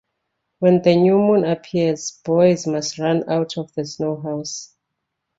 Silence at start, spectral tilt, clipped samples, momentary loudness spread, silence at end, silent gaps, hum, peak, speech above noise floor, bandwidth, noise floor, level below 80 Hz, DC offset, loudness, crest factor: 0.6 s; -6 dB/octave; under 0.1%; 12 LU; 0.75 s; none; none; -2 dBFS; 60 dB; 8 kHz; -78 dBFS; -60 dBFS; under 0.1%; -19 LUFS; 18 dB